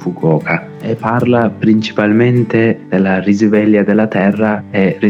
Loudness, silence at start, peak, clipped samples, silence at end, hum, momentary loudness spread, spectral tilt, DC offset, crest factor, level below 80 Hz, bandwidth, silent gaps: -13 LUFS; 0 s; 0 dBFS; under 0.1%; 0 s; none; 5 LU; -8 dB/octave; under 0.1%; 10 dB; -56 dBFS; 7.4 kHz; none